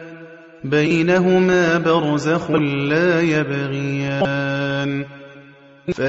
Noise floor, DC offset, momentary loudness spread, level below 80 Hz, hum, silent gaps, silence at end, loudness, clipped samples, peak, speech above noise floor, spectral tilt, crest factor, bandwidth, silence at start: -45 dBFS; under 0.1%; 13 LU; -54 dBFS; none; none; 0 s; -18 LUFS; under 0.1%; -4 dBFS; 27 dB; -6.5 dB/octave; 14 dB; 8 kHz; 0 s